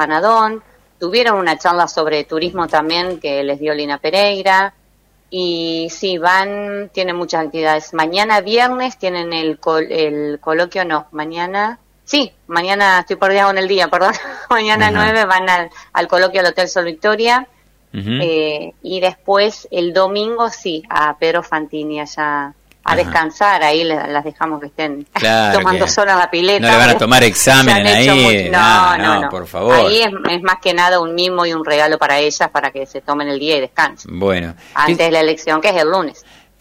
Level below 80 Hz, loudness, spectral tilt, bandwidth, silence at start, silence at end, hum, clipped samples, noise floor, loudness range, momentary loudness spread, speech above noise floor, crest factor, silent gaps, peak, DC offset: -46 dBFS; -14 LUFS; -3.5 dB/octave; 16 kHz; 0 s; 0.5 s; none; under 0.1%; -54 dBFS; 8 LU; 12 LU; 40 dB; 14 dB; none; 0 dBFS; under 0.1%